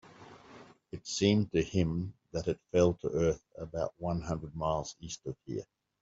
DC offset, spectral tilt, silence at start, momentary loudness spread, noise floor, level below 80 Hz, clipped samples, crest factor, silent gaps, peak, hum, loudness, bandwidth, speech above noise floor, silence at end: under 0.1%; -6 dB/octave; 0.05 s; 14 LU; -55 dBFS; -54 dBFS; under 0.1%; 22 dB; none; -12 dBFS; none; -33 LUFS; 8 kHz; 23 dB; 0.4 s